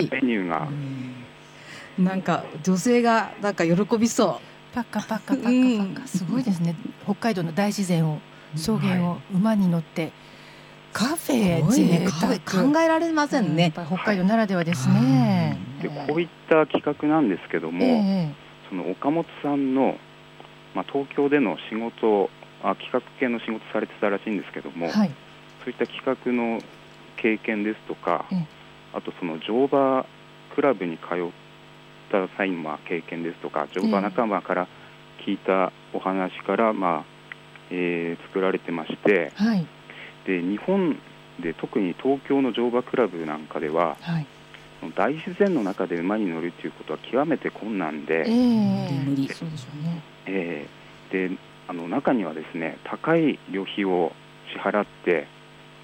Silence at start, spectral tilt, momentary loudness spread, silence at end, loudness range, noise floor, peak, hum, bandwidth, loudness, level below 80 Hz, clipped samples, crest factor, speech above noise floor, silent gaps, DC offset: 0 s; -6.5 dB/octave; 14 LU; 0 s; 5 LU; -48 dBFS; -6 dBFS; none; 17 kHz; -25 LUFS; -62 dBFS; under 0.1%; 18 dB; 24 dB; none; under 0.1%